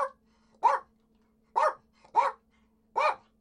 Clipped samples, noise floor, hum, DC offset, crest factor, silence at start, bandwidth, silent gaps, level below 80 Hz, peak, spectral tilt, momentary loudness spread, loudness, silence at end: under 0.1%; -68 dBFS; none; under 0.1%; 20 dB; 0 s; 11 kHz; none; -74 dBFS; -12 dBFS; -1.5 dB/octave; 8 LU; -29 LUFS; 0.25 s